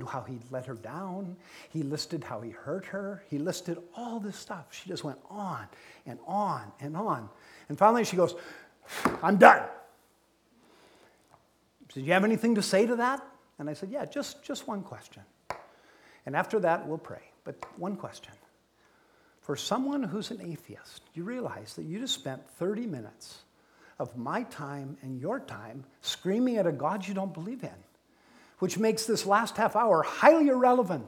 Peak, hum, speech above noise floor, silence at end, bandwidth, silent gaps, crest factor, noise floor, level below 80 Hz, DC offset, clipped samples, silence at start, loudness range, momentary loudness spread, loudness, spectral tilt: 0 dBFS; none; 38 dB; 0 s; 18.5 kHz; none; 30 dB; -67 dBFS; -72 dBFS; under 0.1%; under 0.1%; 0 s; 12 LU; 20 LU; -29 LUFS; -5 dB/octave